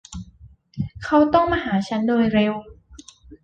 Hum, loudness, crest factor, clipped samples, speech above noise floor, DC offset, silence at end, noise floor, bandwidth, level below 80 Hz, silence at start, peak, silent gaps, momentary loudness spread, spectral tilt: none; -20 LUFS; 18 dB; under 0.1%; 30 dB; under 0.1%; 0.1 s; -49 dBFS; 9 kHz; -46 dBFS; 0.1 s; -4 dBFS; none; 20 LU; -6.5 dB/octave